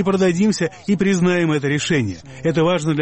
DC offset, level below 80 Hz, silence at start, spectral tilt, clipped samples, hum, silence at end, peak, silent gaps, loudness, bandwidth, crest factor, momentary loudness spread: under 0.1%; -50 dBFS; 0 s; -6 dB/octave; under 0.1%; none; 0 s; -6 dBFS; none; -18 LUFS; 8.8 kHz; 12 dB; 5 LU